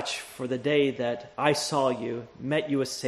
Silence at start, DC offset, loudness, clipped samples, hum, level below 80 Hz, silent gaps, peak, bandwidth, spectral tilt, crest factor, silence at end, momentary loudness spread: 0 s; under 0.1%; -28 LUFS; under 0.1%; none; -66 dBFS; none; -6 dBFS; 13 kHz; -4.5 dB/octave; 22 dB; 0 s; 9 LU